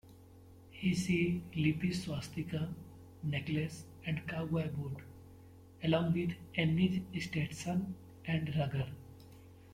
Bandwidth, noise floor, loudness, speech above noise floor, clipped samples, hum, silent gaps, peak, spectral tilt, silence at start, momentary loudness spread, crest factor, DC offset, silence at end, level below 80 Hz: 15.5 kHz; -57 dBFS; -36 LUFS; 22 dB; under 0.1%; none; none; -16 dBFS; -6.5 dB/octave; 0.05 s; 19 LU; 20 dB; under 0.1%; 0 s; -62 dBFS